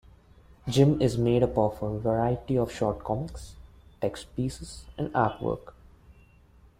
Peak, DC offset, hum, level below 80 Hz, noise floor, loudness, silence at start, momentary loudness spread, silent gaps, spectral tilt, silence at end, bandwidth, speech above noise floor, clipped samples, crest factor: -8 dBFS; under 0.1%; none; -48 dBFS; -57 dBFS; -27 LUFS; 0.65 s; 16 LU; none; -7 dB/octave; 0.7 s; 15.5 kHz; 30 dB; under 0.1%; 20 dB